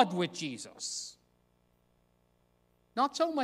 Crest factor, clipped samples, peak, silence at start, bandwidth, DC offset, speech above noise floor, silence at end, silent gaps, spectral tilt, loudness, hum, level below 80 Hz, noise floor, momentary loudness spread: 24 dB; under 0.1%; -10 dBFS; 0 s; 15.5 kHz; under 0.1%; 39 dB; 0 s; none; -3.5 dB/octave; -34 LUFS; 60 Hz at -75 dBFS; -78 dBFS; -71 dBFS; 11 LU